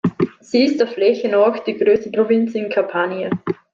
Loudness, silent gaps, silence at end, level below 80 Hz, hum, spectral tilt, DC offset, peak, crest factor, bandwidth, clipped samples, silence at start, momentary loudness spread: -18 LUFS; none; 0.2 s; -60 dBFS; none; -7 dB/octave; under 0.1%; -4 dBFS; 14 dB; 7.4 kHz; under 0.1%; 0.05 s; 7 LU